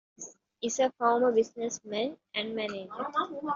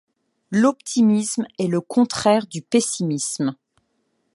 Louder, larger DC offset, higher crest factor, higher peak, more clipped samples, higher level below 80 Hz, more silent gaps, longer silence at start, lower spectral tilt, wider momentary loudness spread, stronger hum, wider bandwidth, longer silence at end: second, -30 LUFS vs -21 LUFS; neither; about the same, 20 dB vs 18 dB; second, -12 dBFS vs -4 dBFS; neither; second, -76 dBFS vs -66 dBFS; neither; second, 0.2 s vs 0.5 s; second, -2 dB/octave vs -5 dB/octave; first, 12 LU vs 7 LU; neither; second, 7.6 kHz vs 11.5 kHz; second, 0 s vs 0.8 s